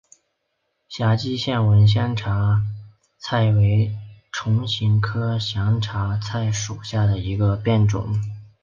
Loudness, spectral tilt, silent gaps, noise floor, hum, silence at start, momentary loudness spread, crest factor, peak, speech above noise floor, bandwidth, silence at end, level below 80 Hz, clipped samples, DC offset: -21 LUFS; -6 dB/octave; none; -74 dBFS; none; 0.9 s; 10 LU; 14 dB; -6 dBFS; 54 dB; 7.4 kHz; 0.15 s; -42 dBFS; under 0.1%; under 0.1%